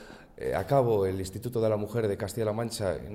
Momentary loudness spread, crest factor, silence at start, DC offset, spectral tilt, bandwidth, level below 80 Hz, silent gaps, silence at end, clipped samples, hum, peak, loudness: 9 LU; 16 dB; 0 s; under 0.1%; -6.5 dB/octave; 16.5 kHz; -54 dBFS; none; 0 s; under 0.1%; none; -12 dBFS; -29 LUFS